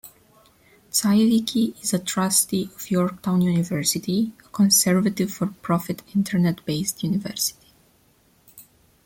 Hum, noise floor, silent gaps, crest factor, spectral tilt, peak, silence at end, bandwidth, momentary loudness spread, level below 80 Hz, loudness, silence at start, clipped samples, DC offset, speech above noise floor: none; -60 dBFS; none; 18 dB; -4.5 dB/octave; -6 dBFS; 0.45 s; 17 kHz; 8 LU; -60 dBFS; -22 LUFS; 0.05 s; under 0.1%; under 0.1%; 38 dB